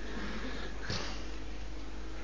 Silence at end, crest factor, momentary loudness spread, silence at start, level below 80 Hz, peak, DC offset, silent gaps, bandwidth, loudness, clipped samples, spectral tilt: 0 s; 18 dB; 8 LU; 0 s; -44 dBFS; -22 dBFS; 1%; none; 7.6 kHz; -41 LUFS; under 0.1%; -4.5 dB/octave